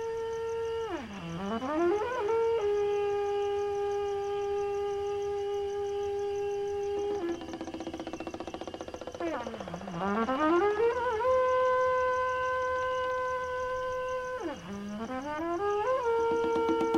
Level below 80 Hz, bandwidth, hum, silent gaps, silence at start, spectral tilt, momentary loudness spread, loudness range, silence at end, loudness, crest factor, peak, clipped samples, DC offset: -58 dBFS; 12 kHz; none; none; 0 s; -5.5 dB/octave; 12 LU; 7 LU; 0 s; -31 LUFS; 16 dB; -14 dBFS; under 0.1%; under 0.1%